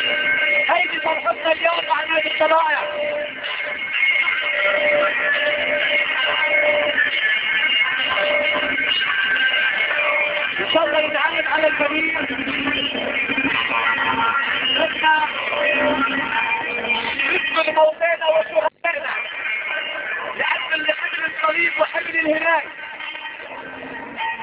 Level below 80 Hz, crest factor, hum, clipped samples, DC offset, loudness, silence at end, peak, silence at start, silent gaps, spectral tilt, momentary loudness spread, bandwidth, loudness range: -58 dBFS; 16 dB; none; under 0.1%; under 0.1%; -18 LUFS; 0 s; -4 dBFS; 0 s; none; -5.5 dB/octave; 7 LU; 4 kHz; 4 LU